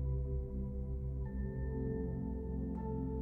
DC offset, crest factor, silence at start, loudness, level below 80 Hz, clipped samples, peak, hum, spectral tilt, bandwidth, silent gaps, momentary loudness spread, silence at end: under 0.1%; 12 dB; 0 s; -41 LUFS; -42 dBFS; under 0.1%; -26 dBFS; none; -12.5 dB/octave; 1.9 kHz; none; 3 LU; 0 s